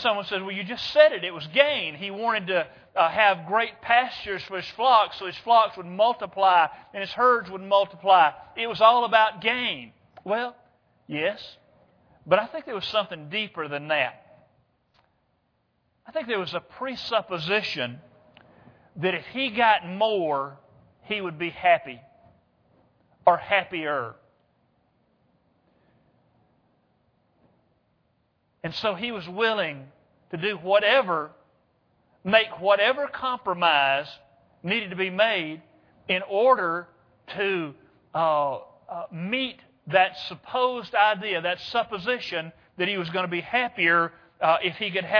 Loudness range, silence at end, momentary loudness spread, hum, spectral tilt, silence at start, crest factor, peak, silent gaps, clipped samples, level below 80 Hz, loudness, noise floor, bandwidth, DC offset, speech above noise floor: 8 LU; 0 s; 14 LU; none; -5.5 dB/octave; 0 s; 24 dB; -2 dBFS; none; under 0.1%; -68 dBFS; -24 LUFS; -71 dBFS; 5.4 kHz; under 0.1%; 47 dB